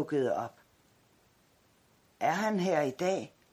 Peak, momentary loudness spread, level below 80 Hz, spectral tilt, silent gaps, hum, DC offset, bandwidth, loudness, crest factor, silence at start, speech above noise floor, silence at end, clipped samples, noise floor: -14 dBFS; 7 LU; -76 dBFS; -5.5 dB/octave; none; none; under 0.1%; 15.5 kHz; -32 LUFS; 20 dB; 0 s; 36 dB; 0.25 s; under 0.1%; -67 dBFS